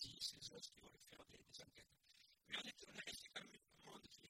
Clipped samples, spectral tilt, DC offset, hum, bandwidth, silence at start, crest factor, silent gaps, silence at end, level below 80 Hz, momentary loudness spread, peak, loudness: under 0.1%; -1 dB/octave; under 0.1%; none; 16 kHz; 0 s; 22 dB; none; 0 s; -82 dBFS; 17 LU; -34 dBFS; -54 LUFS